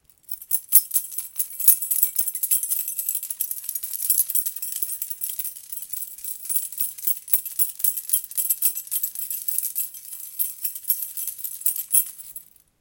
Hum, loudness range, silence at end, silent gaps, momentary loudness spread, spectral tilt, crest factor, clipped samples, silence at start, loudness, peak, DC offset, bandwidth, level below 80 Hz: none; 5 LU; 0.4 s; none; 14 LU; 4 dB/octave; 26 dB; under 0.1%; 0.3 s; -22 LUFS; 0 dBFS; under 0.1%; 18 kHz; -72 dBFS